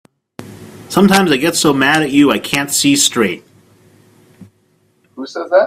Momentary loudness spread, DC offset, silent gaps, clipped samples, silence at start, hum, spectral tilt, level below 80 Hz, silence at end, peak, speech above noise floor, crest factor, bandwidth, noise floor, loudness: 20 LU; under 0.1%; none; under 0.1%; 0.4 s; none; -3.5 dB/octave; -52 dBFS; 0 s; 0 dBFS; 45 dB; 16 dB; 16 kHz; -57 dBFS; -12 LUFS